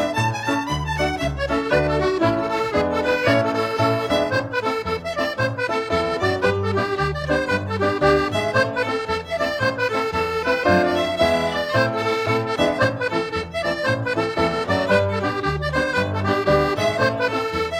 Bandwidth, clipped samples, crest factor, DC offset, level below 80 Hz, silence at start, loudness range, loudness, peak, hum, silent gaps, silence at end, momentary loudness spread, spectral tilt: 16 kHz; under 0.1%; 16 dB; under 0.1%; -40 dBFS; 0 s; 2 LU; -21 LUFS; -4 dBFS; none; none; 0 s; 5 LU; -5.5 dB/octave